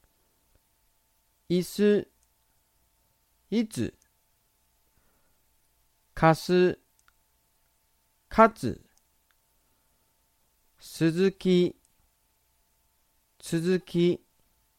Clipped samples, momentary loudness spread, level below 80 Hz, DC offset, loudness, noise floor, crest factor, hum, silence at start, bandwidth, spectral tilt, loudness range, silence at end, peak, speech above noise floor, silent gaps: under 0.1%; 17 LU; -58 dBFS; under 0.1%; -26 LUFS; -70 dBFS; 24 dB; none; 1.5 s; 16 kHz; -6.5 dB/octave; 11 LU; 0.65 s; -6 dBFS; 46 dB; none